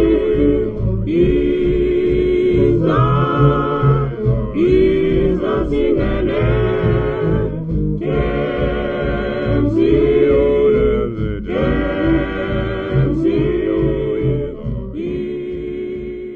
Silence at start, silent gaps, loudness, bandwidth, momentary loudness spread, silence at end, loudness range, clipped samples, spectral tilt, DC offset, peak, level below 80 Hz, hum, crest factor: 0 s; none; -17 LUFS; 5.4 kHz; 9 LU; 0 s; 4 LU; under 0.1%; -10 dB/octave; under 0.1%; -2 dBFS; -26 dBFS; none; 14 dB